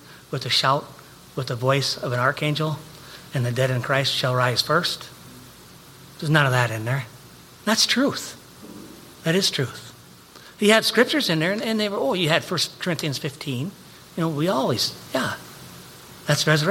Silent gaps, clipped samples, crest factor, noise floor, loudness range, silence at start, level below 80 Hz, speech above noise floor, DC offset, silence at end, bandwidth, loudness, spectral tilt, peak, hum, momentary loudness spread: none; under 0.1%; 22 dB; -46 dBFS; 3 LU; 0.05 s; -60 dBFS; 24 dB; under 0.1%; 0 s; 17 kHz; -22 LUFS; -4 dB/octave; -2 dBFS; none; 22 LU